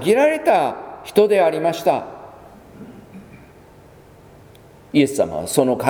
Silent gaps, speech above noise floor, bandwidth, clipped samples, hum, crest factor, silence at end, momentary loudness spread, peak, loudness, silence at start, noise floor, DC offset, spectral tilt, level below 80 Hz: none; 29 dB; over 20 kHz; under 0.1%; none; 20 dB; 0 s; 23 LU; 0 dBFS; -18 LUFS; 0 s; -46 dBFS; under 0.1%; -5 dB/octave; -56 dBFS